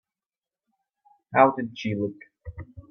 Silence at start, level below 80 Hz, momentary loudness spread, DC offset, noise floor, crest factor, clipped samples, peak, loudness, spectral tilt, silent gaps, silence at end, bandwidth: 1.3 s; -56 dBFS; 24 LU; under 0.1%; under -90 dBFS; 24 dB; under 0.1%; -4 dBFS; -24 LUFS; -7.5 dB/octave; none; 0.1 s; 6.8 kHz